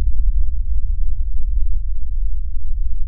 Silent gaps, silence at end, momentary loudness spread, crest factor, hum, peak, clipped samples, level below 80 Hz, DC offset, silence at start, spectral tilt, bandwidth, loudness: none; 0 s; 5 LU; 10 dB; none; -4 dBFS; under 0.1%; -18 dBFS; 4%; 0 s; -12 dB/octave; 0.2 kHz; -26 LUFS